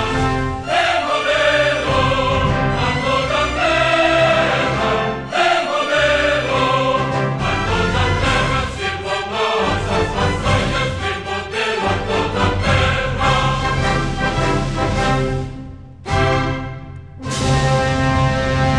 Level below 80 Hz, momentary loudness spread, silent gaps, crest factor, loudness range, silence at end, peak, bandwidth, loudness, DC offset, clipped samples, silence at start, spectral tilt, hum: -30 dBFS; 7 LU; none; 14 dB; 4 LU; 0 s; -4 dBFS; 11.5 kHz; -17 LUFS; 0.3%; under 0.1%; 0 s; -5 dB/octave; none